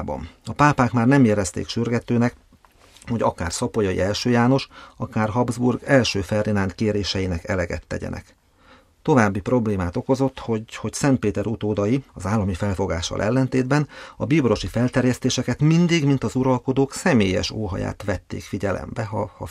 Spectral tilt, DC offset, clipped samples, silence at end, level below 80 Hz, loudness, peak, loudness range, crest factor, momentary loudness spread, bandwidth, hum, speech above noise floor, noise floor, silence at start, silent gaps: -6 dB/octave; under 0.1%; under 0.1%; 0 s; -44 dBFS; -22 LUFS; -2 dBFS; 3 LU; 20 dB; 10 LU; 13.5 kHz; none; 32 dB; -53 dBFS; 0 s; none